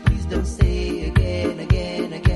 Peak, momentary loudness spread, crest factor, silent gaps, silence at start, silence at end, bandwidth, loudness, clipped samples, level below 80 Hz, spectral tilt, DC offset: -2 dBFS; 4 LU; 16 dB; none; 0 s; 0 s; 11.5 kHz; -22 LUFS; under 0.1%; -24 dBFS; -7 dB/octave; under 0.1%